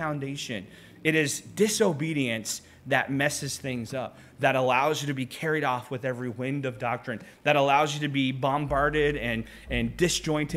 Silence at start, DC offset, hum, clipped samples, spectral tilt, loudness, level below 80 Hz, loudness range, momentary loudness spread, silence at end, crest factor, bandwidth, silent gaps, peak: 0 s; under 0.1%; none; under 0.1%; -4.5 dB/octave; -27 LUFS; -48 dBFS; 2 LU; 10 LU; 0 s; 22 dB; 16 kHz; none; -6 dBFS